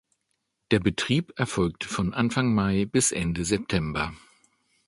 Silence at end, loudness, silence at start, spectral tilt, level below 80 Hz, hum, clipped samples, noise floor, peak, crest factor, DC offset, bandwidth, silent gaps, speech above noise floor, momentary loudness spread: 0.7 s; -26 LUFS; 0.7 s; -4.5 dB/octave; -46 dBFS; none; under 0.1%; -77 dBFS; -6 dBFS; 20 dB; under 0.1%; 11.5 kHz; none; 52 dB; 6 LU